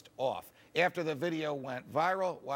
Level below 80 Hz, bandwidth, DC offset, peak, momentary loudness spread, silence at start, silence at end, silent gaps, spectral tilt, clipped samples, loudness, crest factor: -78 dBFS; 17 kHz; under 0.1%; -16 dBFS; 7 LU; 0.05 s; 0 s; none; -5.5 dB/octave; under 0.1%; -34 LUFS; 18 dB